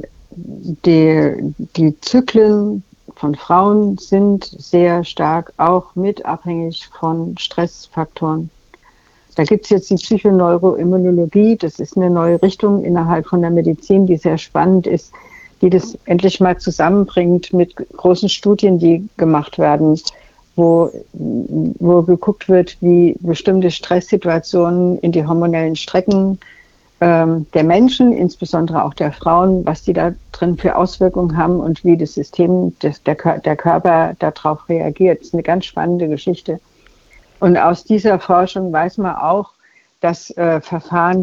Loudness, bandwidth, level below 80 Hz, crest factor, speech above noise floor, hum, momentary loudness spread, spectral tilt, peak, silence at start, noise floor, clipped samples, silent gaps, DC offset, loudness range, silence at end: -15 LUFS; 7.6 kHz; -44 dBFS; 14 dB; 37 dB; none; 9 LU; -7.5 dB/octave; -2 dBFS; 0 s; -51 dBFS; under 0.1%; none; under 0.1%; 3 LU; 0 s